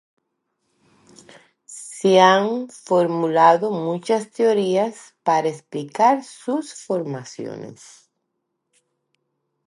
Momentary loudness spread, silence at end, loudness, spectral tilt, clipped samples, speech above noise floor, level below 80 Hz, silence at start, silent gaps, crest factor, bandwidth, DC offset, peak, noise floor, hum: 18 LU; 1.95 s; -19 LUFS; -5 dB/octave; under 0.1%; 57 dB; -78 dBFS; 1.7 s; none; 20 dB; 11.5 kHz; under 0.1%; -2 dBFS; -76 dBFS; none